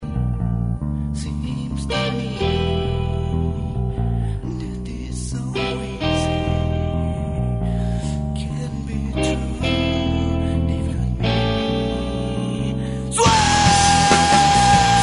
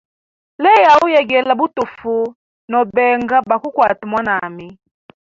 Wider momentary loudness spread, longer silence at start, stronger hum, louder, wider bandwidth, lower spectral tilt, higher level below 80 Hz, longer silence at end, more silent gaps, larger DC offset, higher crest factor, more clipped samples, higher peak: about the same, 12 LU vs 11 LU; second, 0 s vs 0.6 s; neither; second, -20 LUFS vs -14 LUFS; first, 11 kHz vs 7.6 kHz; about the same, -4.5 dB/octave vs -5 dB/octave; first, -28 dBFS vs -56 dBFS; second, 0 s vs 0.6 s; second, none vs 2.35-2.68 s; neither; first, 20 dB vs 14 dB; neither; about the same, 0 dBFS vs -2 dBFS